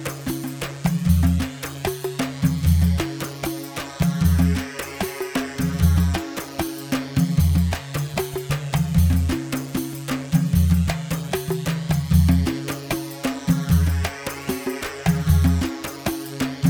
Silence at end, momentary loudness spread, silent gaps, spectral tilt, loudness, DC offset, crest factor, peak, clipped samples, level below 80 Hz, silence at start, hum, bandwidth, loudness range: 0 s; 9 LU; none; -6 dB/octave; -23 LUFS; under 0.1%; 16 dB; -4 dBFS; under 0.1%; -30 dBFS; 0 s; none; over 20 kHz; 1 LU